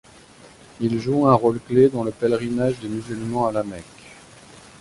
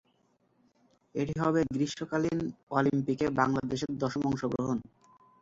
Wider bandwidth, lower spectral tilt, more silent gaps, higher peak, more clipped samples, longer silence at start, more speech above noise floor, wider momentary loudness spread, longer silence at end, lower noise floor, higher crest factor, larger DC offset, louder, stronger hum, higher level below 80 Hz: first, 11.5 kHz vs 7.8 kHz; about the same, -7.5 dB/octave vs -6.5 dB/octave; second, none vs 2.63-2.67 s; first, -2 dBFS vs -10 dBFS; neither; second, 0.8 s vs 1.15 s; second, 27 dB vs 41 dB; first, 12 LU vs 6 LU; about the same, 0.65 s vs 0.6 s; second, -47 dBFS vs -71 dBFS; about the same, 20 dB vs 20 dB; neither; first, -21 LUFS vs -31 LUFS; neither; first, -54 dBFS vs -60 dBFS